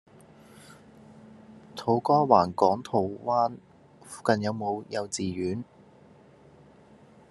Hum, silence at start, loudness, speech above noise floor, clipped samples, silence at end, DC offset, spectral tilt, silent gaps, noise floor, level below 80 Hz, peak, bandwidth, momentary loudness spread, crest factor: none; 0.7 s; -27 LUFS; 29 dB; under 0.1%; 1.65 s; under 0.1%; -5.5 dB/octave; none; -55 dBFS; -70 dBFS; -4 dBFS; 12.5 kHz; 16 LU; 24 dB